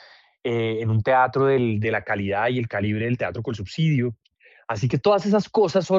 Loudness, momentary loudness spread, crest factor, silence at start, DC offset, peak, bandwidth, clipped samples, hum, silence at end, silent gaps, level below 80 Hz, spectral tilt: -23 LUFS; 10 LU; 14 dB; 0.45 s; under 0.1%; -8 dBFS; 7.6 kHz; under 0.1%; none; 0 s; none; -60 dBFS; -7 dB/octave